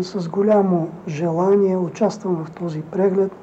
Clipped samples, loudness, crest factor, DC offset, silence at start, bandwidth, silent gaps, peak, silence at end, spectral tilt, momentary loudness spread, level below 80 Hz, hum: under 0.1%; -20 LUFS; 14 dB; under 0.1%; 0 s; 8 kHz; none; -6 dBFS; 0 s; -8 dB/octave; 9 LU; -62 dBFS; none